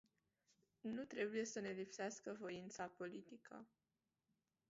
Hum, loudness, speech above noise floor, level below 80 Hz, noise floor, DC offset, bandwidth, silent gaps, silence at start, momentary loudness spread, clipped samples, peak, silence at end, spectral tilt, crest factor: none; -49 LUFS; over 41 dB; -88 dBFS; under -90 dBFS; under 0.1%; 7.6 kHz; none; 0.85 s; 15 LU; under 0.1%; -32 dBFS; 1.05 s; -4 dB/octave; 20 dB